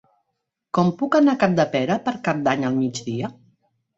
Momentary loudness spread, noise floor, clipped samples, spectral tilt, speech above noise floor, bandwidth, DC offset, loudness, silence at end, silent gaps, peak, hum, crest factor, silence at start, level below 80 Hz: 10 LU; -78 dBFS; under 0.1%; -6.5 dB/octave; 58 dB; 7.8 kHz; under 0.1%; -21 LUFS; 0.65 s; none; -2 dBFS; none; 20 dB; 0.75 s; -62 dBFS